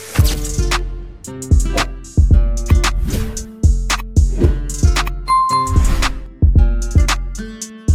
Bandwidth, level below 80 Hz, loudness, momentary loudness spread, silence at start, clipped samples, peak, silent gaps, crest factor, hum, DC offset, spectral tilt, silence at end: 15.5 kHz; -16 dBFS; -17 LUFS; 11 LU; 0 s; under 0.1%; 0 dBFS; none; 14 dB; none; under 0.1%; -5 dB/octave; 0 s